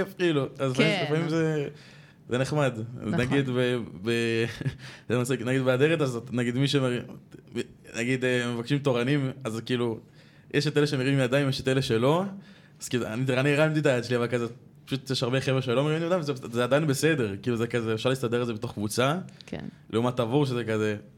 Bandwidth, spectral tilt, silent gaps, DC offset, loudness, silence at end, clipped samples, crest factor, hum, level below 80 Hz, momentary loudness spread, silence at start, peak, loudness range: 16 kHz; -6 dB/octave; none; under 0.1%; -27 LUFS; 0.1 s; under 0.1%; 18 dB; none; -62 dBFS; 11 LU; 0 s; -8 dBFS; 2 LU